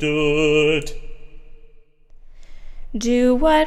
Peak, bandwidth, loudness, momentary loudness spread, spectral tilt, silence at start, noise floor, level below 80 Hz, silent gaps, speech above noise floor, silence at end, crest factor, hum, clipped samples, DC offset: -4 dBFS; 13 kHz; -18 LUFS; 18 LU; -5 dB/octave; 0 s; -45 dBFS; -32 dBFS; none; 29 dB; 0 s; 16 dB; none; under 0.1%; under 0.1%